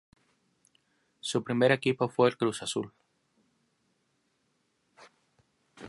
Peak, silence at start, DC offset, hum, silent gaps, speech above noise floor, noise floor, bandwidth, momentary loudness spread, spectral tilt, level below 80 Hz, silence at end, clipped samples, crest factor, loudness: -8 dBFS; 1.25 s; under 0.1%; none; none; 47 dB; -75 dBFS; 11.5 kHz; 11 LU; -5 dB/octave; -74 dBFS; 0 s; under 0.1%; 24 dB; -28 LUFS